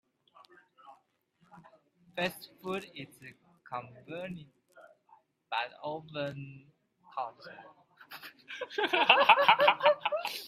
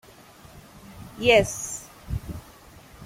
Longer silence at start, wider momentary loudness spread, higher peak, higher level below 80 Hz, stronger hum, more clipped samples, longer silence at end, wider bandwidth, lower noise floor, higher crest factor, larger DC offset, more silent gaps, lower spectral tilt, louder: first, 0.9 s vs 0.55 s; about the same, 26 LU vs 25 LU; about the same, -4 dBFS vs -6 dBFS; second, -78 dBFS vs -44 dBFS; neither; neither; about the same, 0 s vs 0 s; about the same, 15.5 kHz vs 16.5 kHz; first, -71 dBFS vs -49 dBFS; first, 28 dB vs 22 dB; neither; neither; about the same, -3.5 dB/octave vs -3.5 dB/octave; second, -28 LUFS vs -24 LUFS